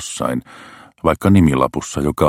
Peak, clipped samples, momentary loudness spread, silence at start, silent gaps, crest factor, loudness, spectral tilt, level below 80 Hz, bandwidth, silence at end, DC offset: 0 dBFS; under 0.1%; 10 LU; 0 s; none; 16 dB; -17 LUFS; -6.5 dB/octave; -36 dBFS; 16.5 kHz; 0 s; under 0.1%